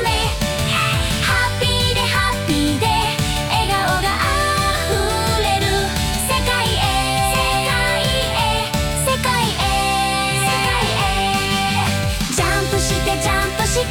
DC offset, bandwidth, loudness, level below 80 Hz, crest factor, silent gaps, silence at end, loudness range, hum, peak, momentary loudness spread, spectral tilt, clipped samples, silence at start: under 0.1%; 17.5 kHz; -17 LUFS; -28 dBFS; 14 dB; none; 0 s; 0 LU; none; -4 dBFS; 2 LU; -3.5 dB/octave; under 0.1%; 0 s